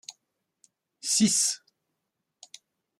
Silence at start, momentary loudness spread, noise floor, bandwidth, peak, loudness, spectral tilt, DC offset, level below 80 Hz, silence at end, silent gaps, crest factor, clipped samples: 0.1 s; 17 LU; -83 dBFS; 15.5 kHz; -12 dBFS; -25 LUFS; -2 dB/octave; under 0.1%; -72 dBFS; 1.45 s; none; 20 dB; under 0.1%